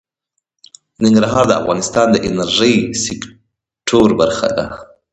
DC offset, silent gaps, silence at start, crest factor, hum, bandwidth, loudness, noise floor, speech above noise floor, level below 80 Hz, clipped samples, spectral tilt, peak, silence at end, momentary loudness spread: under 0.1%; none; 1 s; 16 dB; none; 9 kHz; -14 LUFS; -74 dBFS; 60 dB; -44 dBFS; under 0.1%; -4.5 dB/octave; 0 dBFS; 0.3 s; 13 LU